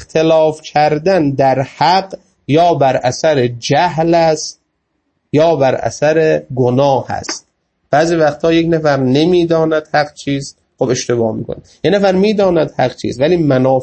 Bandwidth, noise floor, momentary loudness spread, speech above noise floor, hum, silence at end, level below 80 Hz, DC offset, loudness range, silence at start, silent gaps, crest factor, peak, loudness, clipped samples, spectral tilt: 8.6 kHz; -67 dBFS; 9 LU; 54 dB; none; 0 s; -46 dBFS; under 0.1%; 2 LU; 0 s; none; 14 dB; 0 dBFS; -13 LUFS; under 0.1%; -5.5 dB/octave